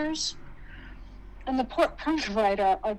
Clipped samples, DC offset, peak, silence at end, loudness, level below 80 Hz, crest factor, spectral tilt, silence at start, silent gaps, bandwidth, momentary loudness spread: under 0.1%; under 0.1%; -8 dBFS; 0 s; -27 LUFS; -46 dBFS; 20 dB; -3.5 dB/octave; 0 s; none; 13 kHz; 23 LU